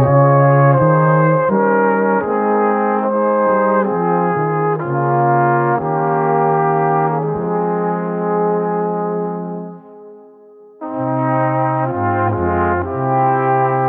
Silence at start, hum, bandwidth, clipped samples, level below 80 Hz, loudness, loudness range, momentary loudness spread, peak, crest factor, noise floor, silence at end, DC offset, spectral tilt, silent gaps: 0 s; none; 3.3 kHz; under 0.1%; -48 dBFS; -15 LUFS; 7 LU; 7 LU; 0 dBFS; 14 dB; -42 dBFS; 0 s; under 0.1%; -13.5 dB/octave; none